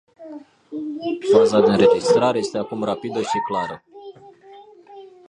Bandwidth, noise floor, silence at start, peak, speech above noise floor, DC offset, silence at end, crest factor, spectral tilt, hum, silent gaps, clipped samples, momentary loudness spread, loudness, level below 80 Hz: 10.5 kHz; -45 dBFS; 0.2 s; -2 dBFS; 27 dB; under 0.1%; 0.2 s; 18 dB; -5.5 dB/octave; none; none; under 0.1%; 24 LU; -19 LUFS; -60 dBFS